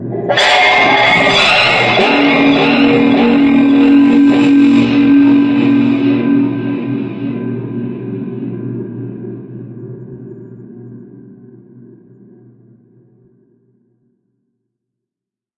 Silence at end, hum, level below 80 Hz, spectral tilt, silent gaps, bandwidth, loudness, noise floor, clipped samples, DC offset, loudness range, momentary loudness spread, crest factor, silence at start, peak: 4.25 s; none; -48 dBFS; -5.5 dB/octave; none; 8.8 kHz; -10 LUFS; -86 dBFS; under 0.1%; under 0.1%; 19 LU; 20 LU; 12 dB; 0 s; 0 dBFS